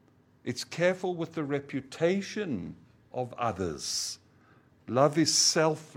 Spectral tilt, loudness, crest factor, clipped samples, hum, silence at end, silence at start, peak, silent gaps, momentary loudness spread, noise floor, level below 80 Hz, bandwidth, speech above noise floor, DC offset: -3.5 dB/octave; -29 LUFS; 22 dB; under 0.1%; none; 0.05 s; 0.45 s; -8 dBFS; none; 15 LU; -61 dBFS; -66 dBFS; 16.5 kHz; 32 dB; under 0.1%